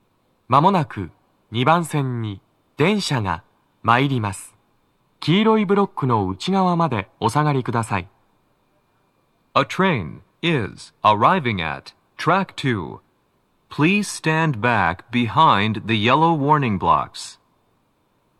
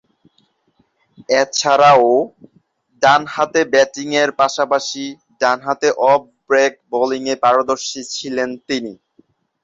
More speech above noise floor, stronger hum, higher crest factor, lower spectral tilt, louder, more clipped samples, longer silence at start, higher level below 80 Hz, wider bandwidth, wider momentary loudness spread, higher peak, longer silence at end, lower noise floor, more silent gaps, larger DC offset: about the same, 45 dB vs 46 dB; neither; about the same, 20 dB vs 16 dB; first, -6 dB/octave vs -3 dB/octave; second, -20 LUFS vs -16 LUFS; neither; second, 0.5 s vs 1.3 s; first, -54 dBFS vs -64 dBFS; first, 13.5 kHz vs 7.8 kHz; about the same, 13 LU vs 11 LU; about the same, 0 dBFS vs -2 dBFS; first, 1.05 s vs 0.7 s; about the same, -64 dBFS vs -62 dBFS; neither; neither